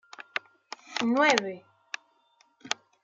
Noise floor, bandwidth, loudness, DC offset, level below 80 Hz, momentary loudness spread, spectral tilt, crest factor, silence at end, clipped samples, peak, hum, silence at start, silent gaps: -66 dBFS; 9.2 kHz; -28 LUFS; under 0.1%; -80 dBFS; 22 LU; -2.5 dB/octave; 26 dB; 0.3 s; under 0.1%; -4 dBFS; none; 0.2 s; none